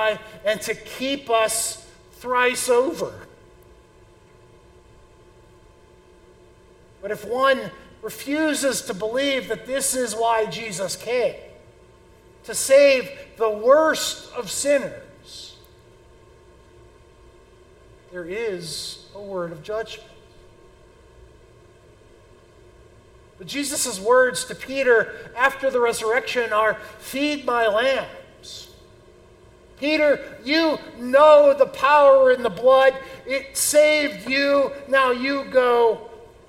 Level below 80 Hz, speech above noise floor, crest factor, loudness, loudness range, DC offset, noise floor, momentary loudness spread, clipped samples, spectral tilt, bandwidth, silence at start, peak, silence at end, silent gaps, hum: -56 dBFS; 31 dB; 20 dB; -20 LUFS; 17 LU; under 0.1%; -51 dBFS; 20 LU; under 0.1%; -2.5 dB/octave; 17 kHz; 0 s; -4 dBFS; 0.25 s; none; none